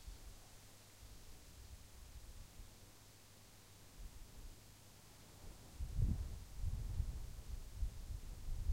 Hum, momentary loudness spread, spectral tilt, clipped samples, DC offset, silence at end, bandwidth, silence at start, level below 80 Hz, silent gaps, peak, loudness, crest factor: none; 15 LU; -5.5 dB/octave; under 0.1%; under 0.1%; 0 s; 16 kHz; 0 s; -48 dBFS; none; -26 dBFS; -51 LUFS; 22 dB